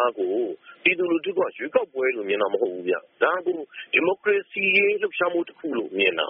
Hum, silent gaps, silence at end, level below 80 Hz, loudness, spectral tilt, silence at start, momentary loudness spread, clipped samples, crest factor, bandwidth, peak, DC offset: none; none; 0 s; -74 dBFS; -23 LUFS; -1 dB/octave; 0 s; 8 LU; under 0.1%; 20 dB; 4.3 kHz; -4 dBFS; under 0.1%